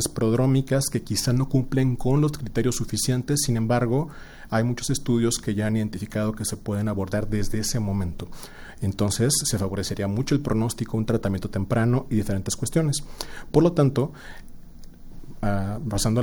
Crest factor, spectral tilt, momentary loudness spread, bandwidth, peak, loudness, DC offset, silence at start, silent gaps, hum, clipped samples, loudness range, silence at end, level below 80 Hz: 18 dB; -5.5 dB/octave; 8 LU; over 20 kHz; -6 dBFS; -24 LUFS; under 0.1%; 0 s; none; none; under 0.1%; 3 LU; 0 s; -38 dBFS